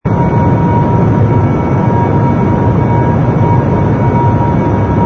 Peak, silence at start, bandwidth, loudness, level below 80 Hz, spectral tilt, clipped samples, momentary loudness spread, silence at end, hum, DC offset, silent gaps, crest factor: 0 dBFS; 0.05 s; 6.4 kHz; -10 LUFS; -26 dBFS; -10 dB/octave; under 0.1%; 1 LU; 0 s; none; under 0.1%; none; 10 dB